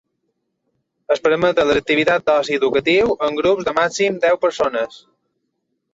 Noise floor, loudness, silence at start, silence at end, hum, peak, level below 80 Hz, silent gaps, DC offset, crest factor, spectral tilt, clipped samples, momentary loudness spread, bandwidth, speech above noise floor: -73 dBFS; -17 LUFS; 1.1 s; 0.95 s; none; -2 dBFS; -52 dBFS; none; under 0.1%; 16 dB; -4 dB/octave; under 0.1%; 5 LU; 8 kHz; 56 dB